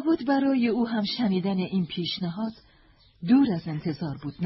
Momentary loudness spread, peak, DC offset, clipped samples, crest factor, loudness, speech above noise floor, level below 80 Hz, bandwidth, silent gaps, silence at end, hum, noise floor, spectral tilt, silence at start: 12 LU; -10 dBFS; under 0.1%; under 0.1%; 16 dB; -26 LUFS; 33 dB; -60 dBFS; 5.8 kHz; none; 0 s; none; -58 dBFS; -10.5 dB/octave; 0 s